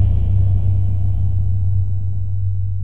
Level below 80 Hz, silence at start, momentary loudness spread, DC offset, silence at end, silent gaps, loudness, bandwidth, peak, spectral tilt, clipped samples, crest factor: -24 dBFS; 0 s; 5 LU; 10%; 0 s; none; -19 LUFS; 1 kHz; -4 dBFS; -11.5 dB/octave; under 0.1%; 12 dB